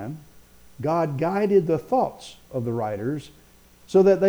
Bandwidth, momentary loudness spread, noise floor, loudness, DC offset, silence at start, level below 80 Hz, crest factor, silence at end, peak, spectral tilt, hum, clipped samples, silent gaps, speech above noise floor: over 20 kHz; 14 LU; -53 dBFS; -24 LUFS; under 0.1%; 0 s; -58 dBFS; 16 dB; 0 s; -8 dBFS; -8 dB/octave; 60 Hz at -55 dBFS; under 0.1%; none; 31 dB